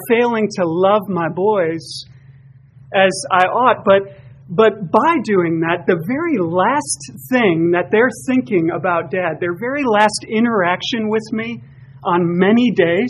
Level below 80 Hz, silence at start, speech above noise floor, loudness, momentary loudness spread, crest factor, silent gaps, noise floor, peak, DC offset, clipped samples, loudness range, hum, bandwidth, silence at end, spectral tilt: -56 dBFS; 0 s; 28 dB; -16 LUFS; 8 LU; 16 dB; none; -44 dBFS; 0 dBFS; under 0.1%; under 0.1%; 2 LU; none; 14 kHz; 0 s; -5 dB/octave